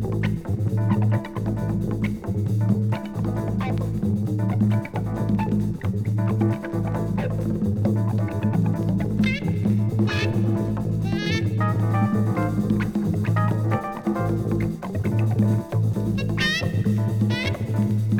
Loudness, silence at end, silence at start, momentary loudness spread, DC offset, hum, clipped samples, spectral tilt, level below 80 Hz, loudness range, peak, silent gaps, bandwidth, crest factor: -23 LUFS; 0 s; 0 s; 4 LU; under 0.1%; none; under 0.1%; -7.5 dB/octave; -42 dBFS; 2 LU; -8 dBFS; none; 13.5 kHz; 14 dB